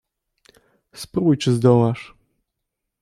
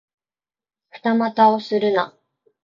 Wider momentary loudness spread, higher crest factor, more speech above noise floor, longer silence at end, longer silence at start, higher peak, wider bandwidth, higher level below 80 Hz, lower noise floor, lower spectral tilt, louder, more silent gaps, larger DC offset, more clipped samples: first, 15 LU vs 10 LU; about the same, 18 dB vs 18 dB; second, 62 dB vs over 72 dB; first, 0.95 s vs 0.6 s; about the same, 0.95 s vs 0.95 s; about the same, -4 dBFS vs -4 dBFS; first, 13.5 kHz vs 7.2 kHz; first, -58 dBFS vs -72 dBFS; second, -80 dBFS vs under -90 dBFS; about the same, -7.5 dB/octave vs -7 dB/octave; about the same, -18 LUFS vs -19 LUFS; neither; neither; neither